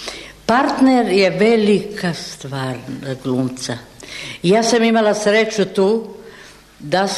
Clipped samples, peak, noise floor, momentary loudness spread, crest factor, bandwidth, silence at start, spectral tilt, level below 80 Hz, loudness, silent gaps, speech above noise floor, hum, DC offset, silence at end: under 0.1%; -4 dBFS; -42 dBFS; 16 LU; 14 dB; 13.5 kHz; 0 s; -5 dB/octave; -52 dBFS; -17 LUFS; none; 25 dB; none; under 0.1%; 0 s